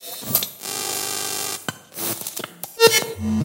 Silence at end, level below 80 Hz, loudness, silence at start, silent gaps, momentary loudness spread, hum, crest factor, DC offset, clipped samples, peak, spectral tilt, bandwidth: 0 s; -56 dBFS; -22 LUFS; 0 s; none; 14 LU; none; 22 dB; under 0.1%; under 0.1%; 0 dBFS; -2.5 dB/octave; 17 kHz